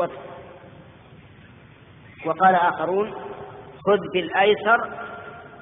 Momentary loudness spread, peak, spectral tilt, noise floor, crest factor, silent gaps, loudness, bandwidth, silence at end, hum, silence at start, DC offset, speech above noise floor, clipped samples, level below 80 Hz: 23 LU; -6 dBFS; -2.5 dB/octave; -48 dBFS; 18 dB; none; -21 LUFS; 3.9 kHz; 0 s; none; 0 s; under 0.1%; 27 dB; under 0.1%; -60 dBFS